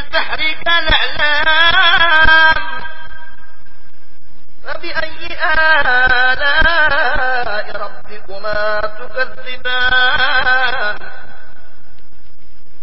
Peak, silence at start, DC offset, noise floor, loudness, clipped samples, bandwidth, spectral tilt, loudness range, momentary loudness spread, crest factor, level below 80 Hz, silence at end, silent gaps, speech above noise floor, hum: 0 dBFS; 0 s; 20%; -48 dBFS; -13 LUFS; under 0.1%; 5.8 kHz; -5 dB/octave; 6 LU; 18 LU; 18 dB; -32 dBFS; 0.15 s; none; 34 dB; none